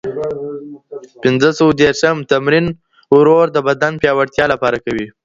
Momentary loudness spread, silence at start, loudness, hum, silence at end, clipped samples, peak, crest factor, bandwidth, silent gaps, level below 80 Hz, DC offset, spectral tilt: 17 LU; 0.05 s; -14 LUFS; none; 0.15 s; under 0.1%; 0 dBFS; 14 dB; 7.8 kHz; none; -48 dBFS; under 0.1%; -5.5 dB/octave